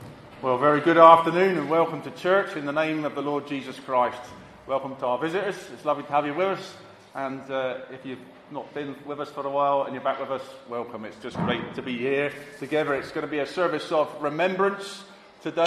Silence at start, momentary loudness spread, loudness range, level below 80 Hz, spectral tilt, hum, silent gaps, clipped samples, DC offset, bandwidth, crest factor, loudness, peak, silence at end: 0 s; 15 LU; 9 LU; -66 dBFS; -6 dB/octave; none; none; under 0.1%; under 0.1%; 13 kHz; 24 dB; -25 LUFS; -2 dBFS; 0 s